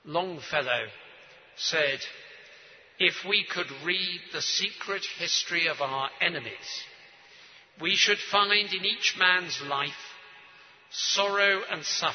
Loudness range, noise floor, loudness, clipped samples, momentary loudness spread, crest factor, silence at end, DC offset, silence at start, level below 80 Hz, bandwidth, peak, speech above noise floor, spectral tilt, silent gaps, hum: 4 LU; -54 dBFS; -26 LUFS; under 0.1%; 15 LU; 22 dB; 0 s; under 0.1%; 0.05 s; -78 dBFS; 6.6 kHz; -6 dBFS; 25 dB; -1 dB/octave; none; none